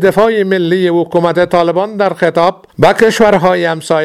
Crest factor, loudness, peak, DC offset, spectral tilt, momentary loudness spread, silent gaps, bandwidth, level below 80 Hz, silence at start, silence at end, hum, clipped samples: 10 dB; -11 LUFS; 0 dBFS; under 0.1%; -6 dB/octave; 5 LU; none; 14.5 kHz; -44 dBFS; 0 s; 0 s; none; 0.4%